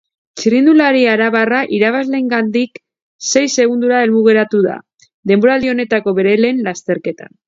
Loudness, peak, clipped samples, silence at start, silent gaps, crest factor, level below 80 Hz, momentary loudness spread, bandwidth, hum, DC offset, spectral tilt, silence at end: -13 LUFS; 0 dBFS; under 0.1%; 0.35 s; 3.02-3.19 s, 5.14-5.23 s; 14 dB; -58 dBFS; 10 LU; 7.8 kHz; none; under 0.1%; -4.5 dB/octave; 0.25 s